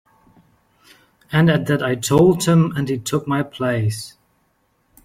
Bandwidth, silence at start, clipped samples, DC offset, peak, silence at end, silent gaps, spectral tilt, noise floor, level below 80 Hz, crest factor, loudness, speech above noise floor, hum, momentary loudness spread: 16 kHz; 1.3 s; under 0.1%; under 0.1%; -2 dBFS; 0.95 s; none; -6 dB/octave; -64 dBFS; -52 dBFS; 18 dB; -18 LUFS; 47 dB; none; 9 LU